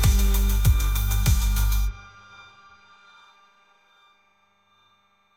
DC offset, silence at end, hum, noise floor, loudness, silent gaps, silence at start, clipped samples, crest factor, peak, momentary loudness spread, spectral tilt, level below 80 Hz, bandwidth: under 0.1%; 3.35 s; 50 Hz at -55 dBFS; -64 dBFS; -23 LUFS; none; 0 s; under 0.1%; 18 dB; -6 dBFS; 25 LU; -4.5 dB/octave; -26 dBFS; 18 kHz